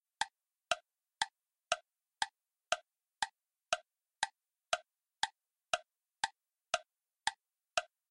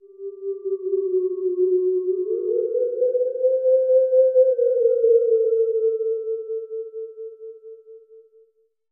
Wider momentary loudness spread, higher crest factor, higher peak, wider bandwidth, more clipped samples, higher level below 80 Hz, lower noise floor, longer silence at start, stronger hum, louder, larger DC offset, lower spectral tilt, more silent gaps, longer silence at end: second, 2 LU vs 17 LU; first, 30 dB vs 14 dB; second, -12 dBFS vs -8 dBFS; first, 12 kHz vs 1.6 kHz; neither; first, -76 dBFS vs under -90 dBFS; about the same, -63 dBFS vs -61 dBFS; about the same, 0.2 s vs 0.2 s; neither; second, -40 LUFS vs -21 LUFS; neither; second, 1 dB/octave vs -10 dB/octave; neither; second, 0.25 s vs 0.75 s